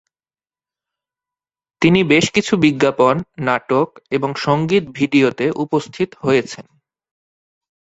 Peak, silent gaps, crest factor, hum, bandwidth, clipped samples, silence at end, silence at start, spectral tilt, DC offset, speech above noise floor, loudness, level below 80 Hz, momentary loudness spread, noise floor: 0 dBFS; none; 18 dB; none; 8.2 kHz; under 0.1%; 1.2 s; 1.8 s; -5.5 dB/octave; under 0.1%; over 74 dB; -17 LUFS; -54 dBFS; 7 LU; under -90 dBFS